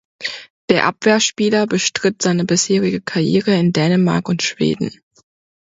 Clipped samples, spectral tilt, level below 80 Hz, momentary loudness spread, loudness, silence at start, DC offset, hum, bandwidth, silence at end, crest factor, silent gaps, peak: under 0.1%; -4.5 dB/octave; -56 dBFS; 10 LU; -17 LUFS; 0.2 s; under 0.1%; none; 8 kHz; 0.75 s; 16 dB; 0.50-0.68 s; 0 dBFS